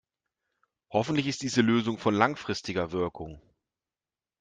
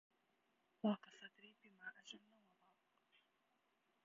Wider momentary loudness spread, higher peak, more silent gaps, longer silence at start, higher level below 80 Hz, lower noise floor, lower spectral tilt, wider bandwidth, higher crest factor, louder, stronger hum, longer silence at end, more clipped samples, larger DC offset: second, 9 LU vs 20 LU; first, -6 dBFS vs -28 dBFS; neither; about the same, 0.9 s vs 0.85 s; first, -62 dBFS vs under -90 dBFS; first, under -90 dBFS vs -84 dBFS; about the same, -5 dB/octave vs -4.5 dB/octave; first, 9.4 kHz vs 7.2 kHz; about the same, 24 dB vs 24 dB; first, -28 LUFS vs -48 LUFS; neither; second, 1 s vs 1.85 s; neither; neither